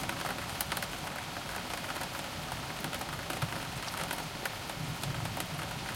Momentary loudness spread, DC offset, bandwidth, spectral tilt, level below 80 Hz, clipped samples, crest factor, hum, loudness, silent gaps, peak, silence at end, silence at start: 3 LU; under 0.1%; 17 kHz; -3 dB/octave; -54 dBFS; under 0.1%; 22 dB; none; -37 LUFS; none; -14 dBFS; 0 s; 0 s